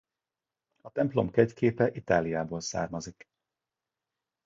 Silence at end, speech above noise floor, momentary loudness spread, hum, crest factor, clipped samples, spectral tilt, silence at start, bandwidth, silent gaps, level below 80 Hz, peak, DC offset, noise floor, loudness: 1.35 s; over 62 dB; 12 LU; none; 22 dB; under 0.1%; -6 dB/octave; 0.85 s; 7.8 kHz; none; -58 dBFS; -8 dBFS; under 0.1%; under -90 dBFS; -29 LUFS